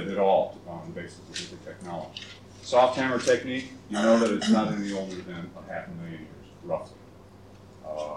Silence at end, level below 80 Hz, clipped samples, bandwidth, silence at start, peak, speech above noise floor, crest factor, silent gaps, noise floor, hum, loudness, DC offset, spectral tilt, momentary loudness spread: 0 s; -62 dBFS; under 0.1%; 11.5 kHz; 0 s; -10 dBFS; 22 dB; 18 dB; none; -50 dBFS; none; -27 LUFS; under 0.1%; -5 dB/octave; 19 LU